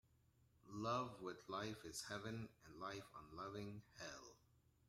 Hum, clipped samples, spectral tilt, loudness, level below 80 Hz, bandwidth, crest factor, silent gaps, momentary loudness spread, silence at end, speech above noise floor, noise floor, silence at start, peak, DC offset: none; under 0.1%; -4.5 dB/octave; -51 LUFS; -76 dBFS; 16 kHz; 20 dB; none; 13 LU; 0.3 s; 26 dB; -76 dBFS; 0.65 s; -32 dBFS; under 0.1%